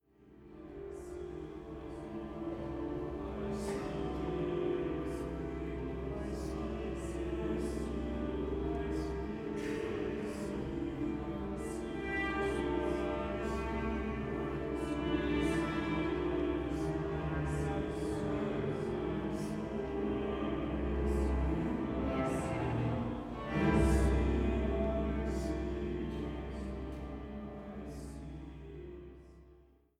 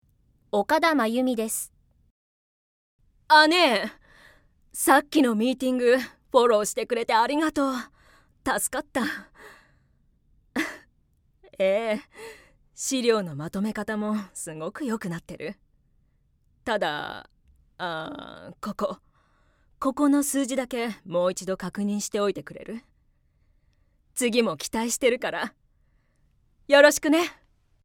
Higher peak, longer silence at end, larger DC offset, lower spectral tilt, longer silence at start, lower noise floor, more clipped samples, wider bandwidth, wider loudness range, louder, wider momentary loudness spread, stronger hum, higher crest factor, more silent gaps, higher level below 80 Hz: second, -18 dBFS vs -2 dBFS; second, 0.35 s vs 0.55 s; neither; first, -7 dB/octave vs -3.5 dB/octave; second, 0.2 s vs 0.55 s; about the same, -63 dBFS vs -65 dBFS; neither; second, 12.5 kHz vs 18.5 kHz; about the same, 8 LU vs 10 LU; second, -37 LUFS vs -24 LUFS; second, 12 LU vs 18 LU; neither; second, 18 dB vs 24 dB; second, none vs 2.11-2.99 s; first, -42 dBFS vs -62 dBFS